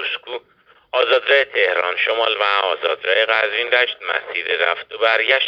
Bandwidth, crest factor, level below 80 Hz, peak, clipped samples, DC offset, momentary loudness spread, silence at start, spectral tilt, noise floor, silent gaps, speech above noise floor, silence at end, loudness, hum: 6.4 kHz; 18 dB; -68 dBFS; 0 dBFS; under 0.1%; under 0.1%; 9 LU; 0 s; -2 dB/octave; -54 dBFS; none; 36 dB; 0 s; -17 LUFS; none